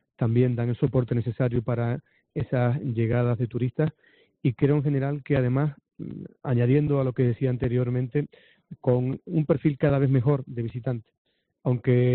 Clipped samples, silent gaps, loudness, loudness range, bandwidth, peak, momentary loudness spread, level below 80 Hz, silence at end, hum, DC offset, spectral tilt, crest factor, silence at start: under 0.1%; 11.18-11.25 s; -25 LUFS; 2 LU; 4.2 kHz; -10 dBFS; 10 LU; -52 dBFS; 0 s; none; under 0.1%; -9 dB/octave; 16 dB; 0.2 s